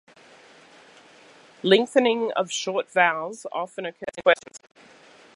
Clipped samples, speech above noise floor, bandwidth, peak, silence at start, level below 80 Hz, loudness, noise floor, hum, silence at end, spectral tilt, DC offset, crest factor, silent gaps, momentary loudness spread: under 0.1%; 28 dB; 11.5 kHz; -2 dBFS; 1.65 s; -74 dBFS; -23 LUFS; -52 dBFS; none; 0.8 s; -3.5 dB/octave; under 0.1%; 24 dB; none; 12 LU